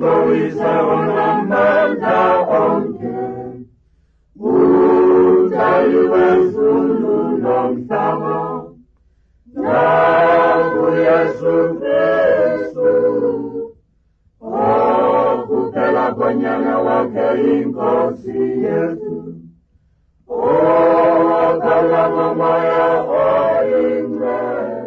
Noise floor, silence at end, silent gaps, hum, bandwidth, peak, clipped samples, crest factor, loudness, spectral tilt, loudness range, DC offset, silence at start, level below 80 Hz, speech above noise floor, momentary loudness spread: -58 dBFS; 0 s; none; none; 6.2 kHz; -4 dBFS; under 0.1%; 10 dB; -15 LUFS; -8.5 dB/octave; 4 LU; under 0.1%; 0 s; -52 dBFS; 43 dB; 11 LU